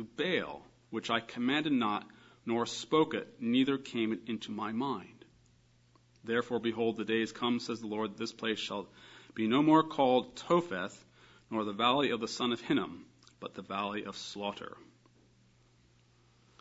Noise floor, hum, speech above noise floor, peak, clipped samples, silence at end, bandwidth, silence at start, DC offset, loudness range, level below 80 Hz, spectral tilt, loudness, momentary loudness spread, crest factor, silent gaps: -66 dBFS; none; 33 dB; -12 dBFS; under 0.1%; 1.75 s; 7.6 kHz; 0 s; under 0.1%; 7 LU; -74 dBFS; -3.5 dB/octave; -33 LUFS; 14 LU; 22 dB; none